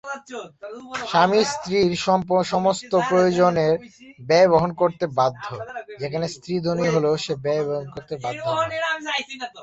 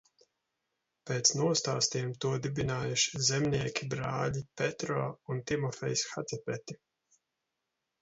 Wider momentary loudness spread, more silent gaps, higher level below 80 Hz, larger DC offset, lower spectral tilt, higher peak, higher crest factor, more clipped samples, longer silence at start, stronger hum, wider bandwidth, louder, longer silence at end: first, 16 LU vs 11 LU; neither; about the same, -58 dBFS vs -62 dBFS; neither; first, -5 dB/octave vs -3.5 dB/octave; first, -4 dBFS vs -12 dBFS; about the same, 18 dB vs 22 dB; neither; second, 0.05 s vs 1.05 s; neither; about the same, 8.4 kHz vs 8 kHz; first, -21 LUFS vs -32 LUFS; second, 0 s vs 1.25 s